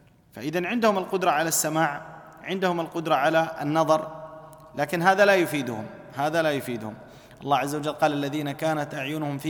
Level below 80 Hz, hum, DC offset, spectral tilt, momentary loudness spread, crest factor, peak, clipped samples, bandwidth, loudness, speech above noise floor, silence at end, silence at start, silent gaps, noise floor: -66 dBFS; none; under 0.1%; -4.5 dB/octave; 16 LU; 20 dB; -6 dBFS; under 0.1%; 19 kHz; -25 LUFS; 20 dB; 0 s; 0.35 s; none; -44 dBFS